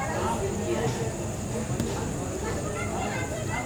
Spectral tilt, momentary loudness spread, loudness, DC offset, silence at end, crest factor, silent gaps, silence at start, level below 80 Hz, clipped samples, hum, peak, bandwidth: -5 dB/octave; 3 LU; -30 LUFS; under 0.1%; 0 s; 16 dB; none; 0 s; -42 dBFS; under 0.1%; none; -14 dBFS; over 20 kHz